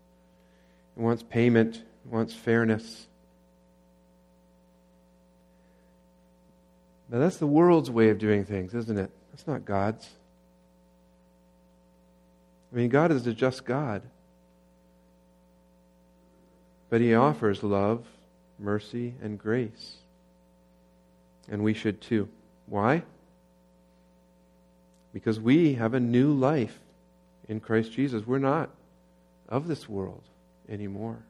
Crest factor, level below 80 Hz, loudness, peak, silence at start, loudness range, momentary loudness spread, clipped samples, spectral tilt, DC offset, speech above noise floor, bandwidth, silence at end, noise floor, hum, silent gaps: 22 dB; -66 dBFS; -27 LUFS; -8 dBFS; 0.95 s; 10 LU; 16 LU; under 0.1%; -8 dB/octave; under 0.1%; 35 dB; 11.5 kHz; 0.1 s; -61 dBFS; none; none